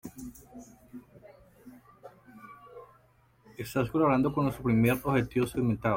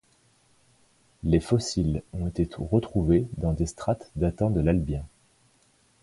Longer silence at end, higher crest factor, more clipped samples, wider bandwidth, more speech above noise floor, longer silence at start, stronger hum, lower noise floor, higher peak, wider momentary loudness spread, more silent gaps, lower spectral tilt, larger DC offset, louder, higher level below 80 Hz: second, 0 s vs 0.95 s; about the same, 16 dB vs 20 dB; neither; first, 16.5 kHz vs 11.5 kHz; about the same, 37 dB vs 38 dB; second, 0.05 s vs 1.25 s; neither; about the same, -64 dBFS vs -64 dBFS; second, -14 dBFS vs -8 dBFS; first, 25 LU vs 9 LU; neither; about the same, -7.5 dB/octave vs -7.5 dB/octave; neither; about the same, -28 LUFS vs -27 LUFS; second, -56 dBFS vs -38 dBFS